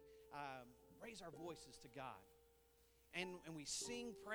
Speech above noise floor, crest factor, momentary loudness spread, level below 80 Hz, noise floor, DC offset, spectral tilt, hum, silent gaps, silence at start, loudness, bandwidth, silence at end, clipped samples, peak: 22 dB; 24 dB; 12 LU; -78 dBFS; -74 dBFS; under 0.1%; -2.5 dB/octave; none; none; 0 s; -52 LUFS; over 20 kHz; 0 s; under 0.1%; -30 dBFS